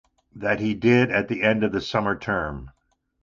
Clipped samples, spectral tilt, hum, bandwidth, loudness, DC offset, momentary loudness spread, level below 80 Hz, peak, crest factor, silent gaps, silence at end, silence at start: under 0.1%; -7 dB/octave; none; 7.4 kHz; -23 LUFS; under 0.1%; 10 LU; -48 dBFS; -4 dBFS; 20 dB; none; 0.55 s; 0.35 s